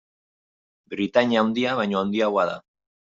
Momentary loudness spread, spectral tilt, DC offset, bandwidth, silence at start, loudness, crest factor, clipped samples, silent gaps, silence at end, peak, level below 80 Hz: 10 LU; -6 dB/octave; under 0.1%; 7.6 kHz; 0.9 s; -23 LUFS; 22 dB; under 0.1%; none; 0.55 s; -4 dBFS; -68 dBFS